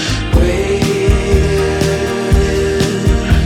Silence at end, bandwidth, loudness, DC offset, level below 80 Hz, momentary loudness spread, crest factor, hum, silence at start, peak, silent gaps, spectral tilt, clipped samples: 0 s; 15.5 kHz; -14 LUFS; under 0.1%; -18 dBFS; 2 LU; 12 dB; none; 0 s; 0 dBFS; none; -5.5 dB/octave; under 0.1%